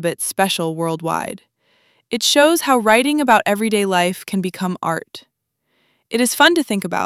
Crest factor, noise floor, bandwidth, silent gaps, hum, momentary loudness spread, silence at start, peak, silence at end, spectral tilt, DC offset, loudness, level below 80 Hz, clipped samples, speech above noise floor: 18 dB; -70 dBFS; 16.5 kHz; none; none; 11 LU; 0 s; 0 dBFS; 0 s; -3.5 dB/octave; under 0.1%; -17 LUFS; -62 dBFS; under 0.1%; 53 dB